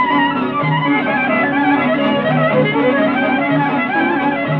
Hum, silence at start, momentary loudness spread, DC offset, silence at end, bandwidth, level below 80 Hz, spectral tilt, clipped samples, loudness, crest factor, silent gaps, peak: none; 0 s; 2 LU; under 0.1%; 0 s; 5 kHz; -54 dBFS; -9 dB/octave; under 0.1%; -15 LUFS; 12 dB; none; -4 dBFS